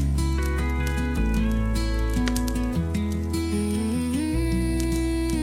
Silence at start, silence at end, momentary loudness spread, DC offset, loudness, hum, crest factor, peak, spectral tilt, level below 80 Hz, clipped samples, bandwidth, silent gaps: 0 s; 0 s; 2 LU; under 0.1%; -25 LUFS; none; 18 dB; -6 dBFS; -6 dB/octave; -28 dBFS; under 0.1%; 16 kHz; none